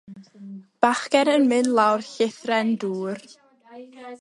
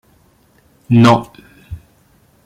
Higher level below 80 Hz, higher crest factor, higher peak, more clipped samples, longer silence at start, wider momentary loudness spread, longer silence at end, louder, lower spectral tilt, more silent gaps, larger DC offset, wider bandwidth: second, -74 dBFS vs -48 dBFS; first, 22 dB vs 16 dB; about the same, -2 dBFS vs 0 dBFS; neither; second, 0.1 s vs 0.9 s; second, 22 LU vs 25 LU; second, 0.05 s vs 0.7 s; second, -22 LUFS vs -12 LUFS; second, -4.5 dB/octave vs -7 dB/octave; neither; neither; about the same, 11.5 kHz vs 11.5 kHz